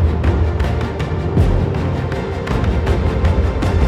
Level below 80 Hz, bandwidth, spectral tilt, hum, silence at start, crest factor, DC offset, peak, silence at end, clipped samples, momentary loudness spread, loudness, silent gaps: -22 dBFS; 9.4 kHz; -8 dB/octave; none; 0 s; 14 dB; under 0.1%; -2 dBFS; 0 s; under 0.1%; 5 LU; -18 LUFS; none